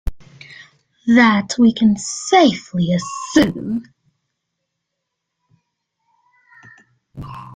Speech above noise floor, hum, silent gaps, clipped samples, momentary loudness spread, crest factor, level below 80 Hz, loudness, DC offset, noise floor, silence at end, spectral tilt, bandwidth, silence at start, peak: 62 dB; none; none; under 0.1%; 21 LU; 18 dB; -40 dBFS; -16 LUFS; under 0.1%; -78 dBFS; 0 s; -5 dB/octave; 9.6 kHz; 0.05 s; -2 dBFS